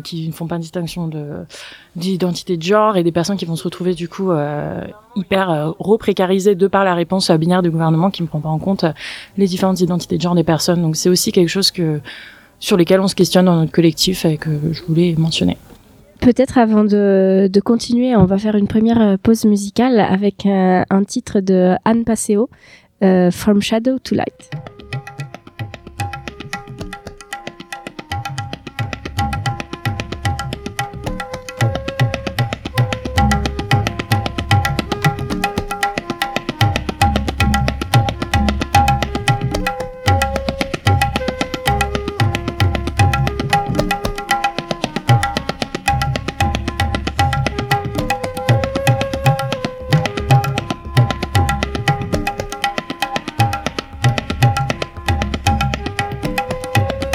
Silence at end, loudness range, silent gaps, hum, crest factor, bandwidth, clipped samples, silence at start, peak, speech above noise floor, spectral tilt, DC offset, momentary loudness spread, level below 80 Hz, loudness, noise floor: 0 s; 8 LU; none; none; 16 dB; 17 kHz; under 0.1%; 0.05 s; 0 dBFS; 29 dB; -5.5 dB/octave; under 0.1%; 13 LU; -32 dBFS; -17 LUFS; -44 dBFS